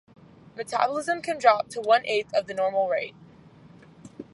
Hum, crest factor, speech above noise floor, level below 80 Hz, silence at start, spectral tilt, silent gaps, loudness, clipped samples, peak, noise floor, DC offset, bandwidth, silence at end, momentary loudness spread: none; 22 dB; 26 dB; -68 dBFS; 0.55 s; -3.5 dB/octave; none; -25 LUFS; under 0.1%; -4 dBFS; -51 dBFS; under 0.1%; 11.5 kHz; 0.1 s; 17 LU